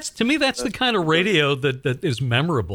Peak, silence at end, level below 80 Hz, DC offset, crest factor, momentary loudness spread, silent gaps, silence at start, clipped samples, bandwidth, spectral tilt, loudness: -4 dBFS; 0 s; -50 dBFS; under 0.1%; 16 dB; 6 LU; none; 0 s; under 0.1%; 19 kHz; -5 dB/octave; -20 LUFS